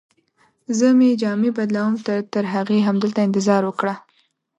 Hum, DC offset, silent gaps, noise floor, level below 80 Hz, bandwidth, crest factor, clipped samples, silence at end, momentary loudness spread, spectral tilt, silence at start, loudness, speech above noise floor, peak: none; under 0.1%; none; -63 dBFS; -70 dBFS; 8.4 kHz; 16 dB; under 0.1%; 0.6 s; 9 LU; -6 dB/octave; 0.7 s; -19 LUFS; 45 dB; -4 dBFS